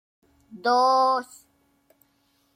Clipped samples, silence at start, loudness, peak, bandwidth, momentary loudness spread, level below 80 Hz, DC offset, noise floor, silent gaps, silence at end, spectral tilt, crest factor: under 0.1%; 0.55 s; -22 LUFS; -10 dBFS; 15.5 kHz; 12 LU; -76 dBFS; under 0.1%; -67 dBFS; none; 1.35 s; -2.5 dB/octave; 16 dB